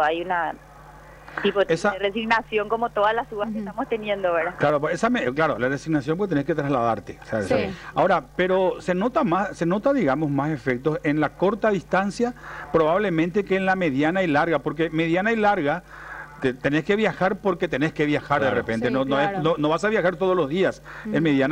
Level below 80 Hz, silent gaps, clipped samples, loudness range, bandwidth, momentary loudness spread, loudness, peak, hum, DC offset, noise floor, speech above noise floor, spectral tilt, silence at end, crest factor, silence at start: -50 dBFS; none; under 0.1%; 2 LU; 15 kHz; 6 LU; -23 LUFS; -8 dBFS; none; under 0.1%; -45 dBFS; 22 dB; -6.5 dB/octave; 0 s; 14 dB; 0 s